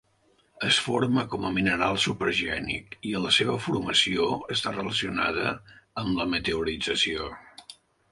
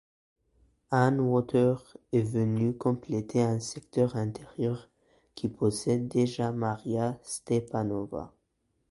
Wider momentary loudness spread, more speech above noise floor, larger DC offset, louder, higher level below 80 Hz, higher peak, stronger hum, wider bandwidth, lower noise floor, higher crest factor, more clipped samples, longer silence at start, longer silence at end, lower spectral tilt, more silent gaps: about the same, 11 LU vs 10 LU; second, 39 dB vs 48 dB; neither; first, -26 LUFS vs -29 LUFS; first, -52 dBFS vs -62 dBFS; about the same, -8 dBFS vs -8 dBFS; neither; about the same, 11.5 kHz vs 11.5 kHz; second, -66 dBFS vs -76 dBFS; about the same, 20 dB vs 20 dB; neither; second, 0.55 s vs 0.9 s; second, 0.4 s vs 0.6 s; second, -3.5 dB/octave vs -7 dB/octave; neither